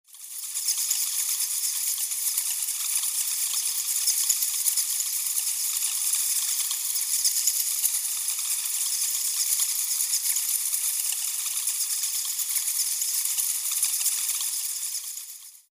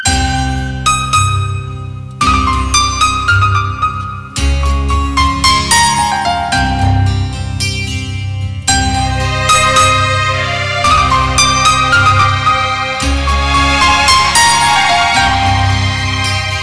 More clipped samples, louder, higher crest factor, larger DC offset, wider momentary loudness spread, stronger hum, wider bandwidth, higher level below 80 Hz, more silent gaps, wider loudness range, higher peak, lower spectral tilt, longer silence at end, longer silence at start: neither; second, -24 LUFS vs -11 LUFS; first, 22 dB vs 10 dB; neither; second, 4 LU vs 9 LU; neither; first, 16 kHz vs 11 kHz; second, under -90 dBFS vs -22 dBFS; neither; second, 1 LU vs 4 LU; second, -6 dBFS vs -2 dBFS; second, 9.5 dB/octave vs -3 dB/octave; about the same, 0.1 s vs 0 s; first, 0.15 s vs 0 s